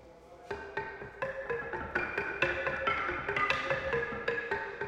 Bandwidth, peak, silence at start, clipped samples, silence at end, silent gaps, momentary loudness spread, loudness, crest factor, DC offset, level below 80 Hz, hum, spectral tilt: 12 kHz; -14 dBFS; 0 s; under 0.1%; 0 s; none; 10 LU; -33 LUFS; 22 dB; under 0.1%; -56 dBFS; none; -5 dB/octave